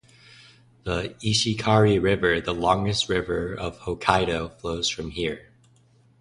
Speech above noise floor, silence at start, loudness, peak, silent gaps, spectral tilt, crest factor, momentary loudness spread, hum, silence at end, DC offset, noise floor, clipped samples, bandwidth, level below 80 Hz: 35 dB; 0.85 s; -24 LUFS; -2 dBFS; none; -4.5 dB/octave; 24 dB; 11 LU; none; 0.8 s; under 0.1%; -58 dBFS; under 0.1%; 11 kHz; -44 dBFS